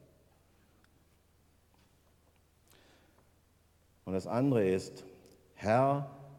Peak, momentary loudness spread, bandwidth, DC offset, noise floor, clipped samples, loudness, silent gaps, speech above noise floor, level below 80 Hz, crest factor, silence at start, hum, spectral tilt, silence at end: -16 dBFS; 22 LU; 16 kHz; under 0.1%; -68 dBFS; under 0.1%; -32 LUFS; none; 37 dB; -72 dBFS; 20 dB; 4.05 s; none; -7.5 dB/octave; 0 s